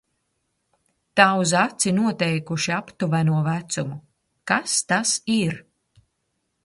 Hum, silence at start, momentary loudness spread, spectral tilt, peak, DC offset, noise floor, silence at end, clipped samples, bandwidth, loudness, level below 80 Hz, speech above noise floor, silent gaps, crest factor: none; 1.15 s; 11 LU; -4 dB/octave; -2 dBFS; under 0.1%; -75 dBFS; 1.05 s; under 0.1%; 11.5 kHz; -22 LUFS; -64 dBFS; 53 dB; none; 22 dB